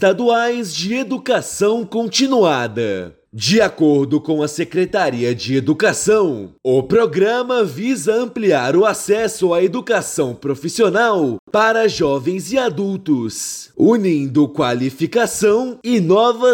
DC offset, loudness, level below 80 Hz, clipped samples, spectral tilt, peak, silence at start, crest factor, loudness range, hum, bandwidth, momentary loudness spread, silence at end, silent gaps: under 0.1%; -17 LUFS; -56 dBFS; under 0.1%; -4.5 dB/octave; -4 dBFS; 0 s; 14 dB; 1 LU; none; 17 kHz; 7 LU; 0 s; 11.39-11.47 s